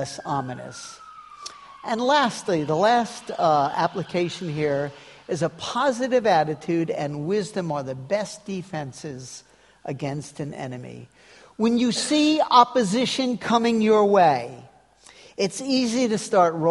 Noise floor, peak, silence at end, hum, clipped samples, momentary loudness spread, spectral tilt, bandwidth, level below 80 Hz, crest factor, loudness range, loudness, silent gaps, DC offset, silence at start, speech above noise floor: -52 dBFS; -2 dBFS; 0 s; none; under 0.1%; 19 LU; -5 dB/octave; 11.5 kHz; -64 dBFS; 22 dB; 10 LU; -23 LUFS; none; under 0.1%; 0 s; 29 dB